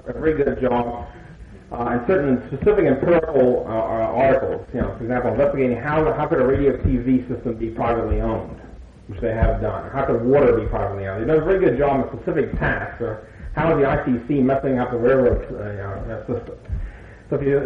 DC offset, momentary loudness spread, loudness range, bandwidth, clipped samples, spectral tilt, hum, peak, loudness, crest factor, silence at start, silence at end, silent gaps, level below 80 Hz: under 0.1%; 12 LU; 3 LU; 5.4 kHz; under 0.1%; -10 dB/octave; none; -6 dBFS; -20 LUFS; 16 dB; 0.05 s; 0 s; none; -34 dBFS